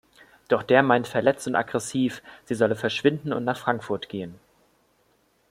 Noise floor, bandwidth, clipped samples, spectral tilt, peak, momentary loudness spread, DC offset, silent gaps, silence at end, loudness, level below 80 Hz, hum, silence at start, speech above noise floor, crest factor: -65 dBFS; 15.5 kHz; under 0.1%; -5 dB/octave; -4 dBFS; 14 LU; under 0.1%; none; 1.15 s; -24 LUFS; -66 dBFS; none; 0.5 s; 41 dB; 22 dB